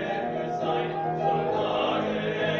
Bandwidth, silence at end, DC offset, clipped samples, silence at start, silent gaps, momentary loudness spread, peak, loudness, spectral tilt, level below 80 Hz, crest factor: 7 kHz; 0 s; under 0.1%; under 0.1%; 0 s; none; 4 LU; -14 dBFS; -27 LUFS; -6.5 dB/octave; -62 dBFS; 14 dB